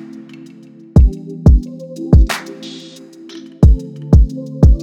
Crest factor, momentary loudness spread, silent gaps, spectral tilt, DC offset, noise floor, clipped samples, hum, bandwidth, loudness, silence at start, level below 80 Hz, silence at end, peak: 12 dB; 21 LU; none; -8 dB/octave; under 0.1%; -38 dBFS; under 0.1%; none; 11 kHz; -14 LUFS; 0.95 s; -16 dBFS; 0 s; 0 dBFS